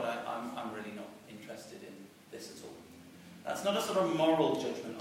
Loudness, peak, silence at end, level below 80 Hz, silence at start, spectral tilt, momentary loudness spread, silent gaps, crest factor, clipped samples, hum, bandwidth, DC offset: -33 LUFS; -16 dBFS; 0 s; -78 dBFS; 0 s; -4.5 dB/octave; 23 LU; none; 20 dB; under 0.1%; none; 16 kHz; under 0.1%